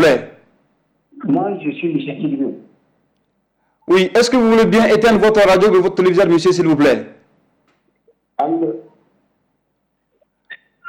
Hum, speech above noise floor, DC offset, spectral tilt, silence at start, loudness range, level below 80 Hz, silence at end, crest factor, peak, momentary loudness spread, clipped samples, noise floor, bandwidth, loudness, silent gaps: none; 56 dB; under 0.1%; -5.5 dB/octave; 0 s; 15 LU; -48 dBFS; 0 s; 12 dB; -6 dBFS; 12 LU; under 0.1%; -69 dBFS; 15.5 kHz; -14 LUFS; none